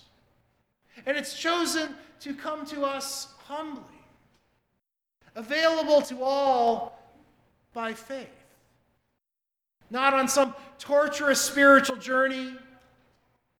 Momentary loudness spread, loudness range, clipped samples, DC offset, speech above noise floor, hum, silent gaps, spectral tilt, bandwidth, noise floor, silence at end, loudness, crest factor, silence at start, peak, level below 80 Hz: 19 LU; 13 LU; under 0.1%; under 0.1%; 62 dB; none; none; -2 dB/octave; 18 kHz; -87 dBFS; 1 s; -25 LUFS; 22 dB; 0.95 s; -6 dBFS; -70 dBFS